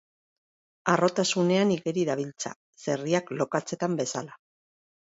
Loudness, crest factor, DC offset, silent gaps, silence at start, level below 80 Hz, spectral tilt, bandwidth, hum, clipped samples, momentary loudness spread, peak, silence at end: -27 LUFS; 22 dB; under 0.1%; 2.56-2.73 s; 0.85 s; -72 dBFS; -4.5 dB/octave; 8 kHz; none; under 0.1%; 13 LU; -8 dBFS; 0.8 s